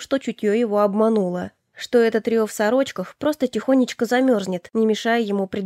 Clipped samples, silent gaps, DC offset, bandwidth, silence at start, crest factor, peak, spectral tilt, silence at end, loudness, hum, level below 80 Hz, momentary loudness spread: under 0.1%; none; under 0.1%; 15.5 kHz; 0 s; 16 dB; -6 dBFS; -5.5 dB/octave; 0 s; -21 LUFS; none; -64 dBFS; 7 LU